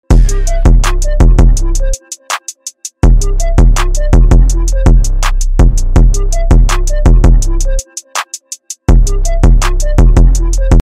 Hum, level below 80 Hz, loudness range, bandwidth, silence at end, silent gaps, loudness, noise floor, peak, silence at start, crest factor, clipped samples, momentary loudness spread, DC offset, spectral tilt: none; -8 dBFS; 2 LU; 12 kHz; 0 s; none; -12 LUFS; -28 dBFS; 0 dBFS; 0.1 s; 6 dB; under 0.1%; 10 LU; under 0.1%; -5.5 dB/octave